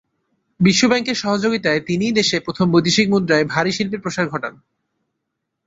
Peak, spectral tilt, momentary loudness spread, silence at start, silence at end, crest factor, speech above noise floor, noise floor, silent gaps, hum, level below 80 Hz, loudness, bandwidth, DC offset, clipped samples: 0 dBFS; -4.5 dB/octave; 8 LU; 0.6 s; 1.15 s; 18 dB; 60 dB; -77 dBFS; none; none; -54 dBFS; -17 LUFS; 8 kHz; under 0.1%; under 0.1%